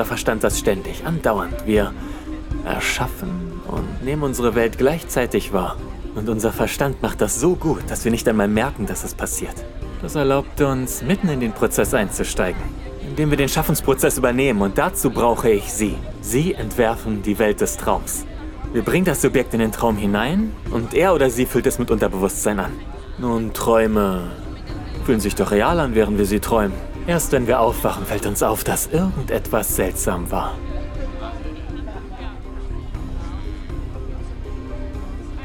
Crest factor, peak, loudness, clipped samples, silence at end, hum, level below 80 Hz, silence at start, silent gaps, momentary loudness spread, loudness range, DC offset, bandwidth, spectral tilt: 18 dB; -2 dBFS; -20 LUFS; under 0.1%; 0 s; none; -30 dBFS; 0 s; none; 14 LU; 5 LU; under 0.1%; 20 kHz; -5 dB/octave